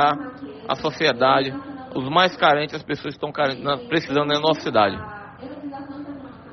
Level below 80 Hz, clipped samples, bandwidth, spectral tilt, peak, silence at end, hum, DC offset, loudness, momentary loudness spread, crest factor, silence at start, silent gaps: -58 dBFS; under 0.1%; 6.4 kHz; -2.5 dB/octave; -4 dBFS; 0 s; none; under 0.1%; -21 LUFS; 17 LU; 18 dB; 0 s; none